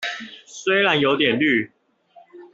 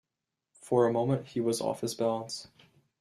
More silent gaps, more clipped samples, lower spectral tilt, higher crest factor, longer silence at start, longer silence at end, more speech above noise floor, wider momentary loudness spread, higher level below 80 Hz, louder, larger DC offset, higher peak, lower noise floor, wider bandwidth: neither; neither; about the same, -4.5 dB/octave vs -5.5 dB/octave; about the same, 18 dB vs 18 dB; second, 0 s vs 0.65 s; second, 0.1 s vs 0.55 s; second, 34 dB vs 58 dB; first, 17 LU vs 10 LU; first, -64 dBFS vs -72 dBFS; first, -19 LUFS vs -30 LUFS; neither; first, -4 dBFS vs -14 dBFS; second, -53 dBFS vs -87 dBFS; second, 8 kHz vs 13.5 kHz